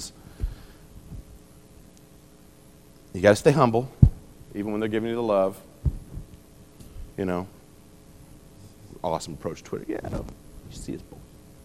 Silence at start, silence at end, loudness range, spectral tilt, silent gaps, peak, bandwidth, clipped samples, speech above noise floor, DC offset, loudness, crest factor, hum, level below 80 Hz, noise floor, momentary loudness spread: 0 s; 0.4 s; 13 LU; -7 dB/octave; none; 0 dBFS; 13 kHz; under 0.1%; 27 dB; 0.1%; -25 LUFS; 28 dB; none; -38 dBFS; -52 dBFS; 25 LU